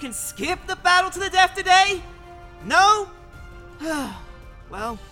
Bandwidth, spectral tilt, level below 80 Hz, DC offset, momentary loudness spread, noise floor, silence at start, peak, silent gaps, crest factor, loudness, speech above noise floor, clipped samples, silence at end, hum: 18 kHz; -1.5 dB/octave; -44 dBFS; under 0.1%; 18 LU; -41 dBFS; 0 s; -4 dBFS; none; 18 dB; -20 LUFS; 20 dB; under 0.1%; 0.05 s; none